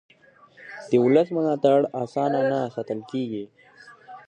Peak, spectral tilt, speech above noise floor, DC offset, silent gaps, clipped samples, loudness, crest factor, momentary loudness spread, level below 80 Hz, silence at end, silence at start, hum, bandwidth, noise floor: -6 dBFS; -7.5 dB/octave; 32 dB; under 0.1%; none; under 0.1%; -23 LUFS; 18 dB; 20 LU; -72 dBFS; 0.1 s; 0.6 s; none; 9.4 kHz; -54 dBFS